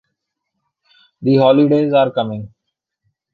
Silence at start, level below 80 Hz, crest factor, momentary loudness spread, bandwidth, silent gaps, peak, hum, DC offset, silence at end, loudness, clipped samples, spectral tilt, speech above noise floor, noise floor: 1.2 s; -60 dBFS; 16 dB; 12 LU; 4.8 kHz; none; -2 dBFS; none; under 0.1%; 0.85 s; -14 LUFS; under 0.1%; -9.5 dB/octave; 62 dB; -76 dBFS